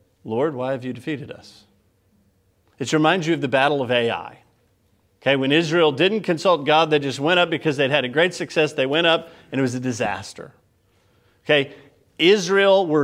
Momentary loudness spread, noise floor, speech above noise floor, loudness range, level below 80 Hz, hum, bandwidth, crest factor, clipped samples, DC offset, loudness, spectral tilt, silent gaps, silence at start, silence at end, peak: 13 LU; -63 dBFS; 43 dB; 5 LU; -66 dBFS; none; 14 kHz; 18 dB; under 0.1%; under 0.1%; -20 LUFS; -5 dB/octave; none; 0.25 s; 0 s; -2 dBFS